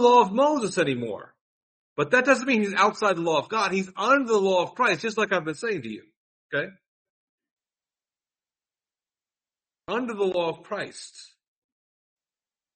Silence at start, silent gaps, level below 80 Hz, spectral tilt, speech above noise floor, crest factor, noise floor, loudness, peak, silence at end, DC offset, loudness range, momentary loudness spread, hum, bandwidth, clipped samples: 0 s; 1.41-1.96 s, 6.17-6.49 s, 6.88-7.38 s, 7.51-7.57 s; -72 dBFS; -4.5 dB/octave; over 66 dB; 20 dB; under -90 dBFS; -24 LUFS; -6 dBFS; 1.5 s; under 0.1%; 16 LU; 15 LU; none; 8.8 kHz; under 0.1%